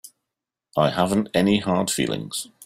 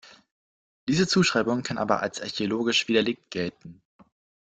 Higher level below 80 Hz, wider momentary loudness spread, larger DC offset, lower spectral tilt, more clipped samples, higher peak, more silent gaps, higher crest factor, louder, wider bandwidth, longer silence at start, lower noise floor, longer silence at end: first, -56 dBFS vs -62 dBFS; second, 8 LU vs 11 LU; neither; about the same, -4.5 dB/octave vs -4.5 dB/octave; neither; about the same, -4 dBFS vs -6 dBFS; second, none vs 0.31-0.87 s; about the same, 18 dB vs 22 dB; first, -22 LUFS vs -25 LUFS; first, 16 kHz vs 9.2 kHz; about the same, 0.05 s vs 0.05 s; second, -85 dBFS vs under -90 dBFS; second, 0 s vs 0.7 s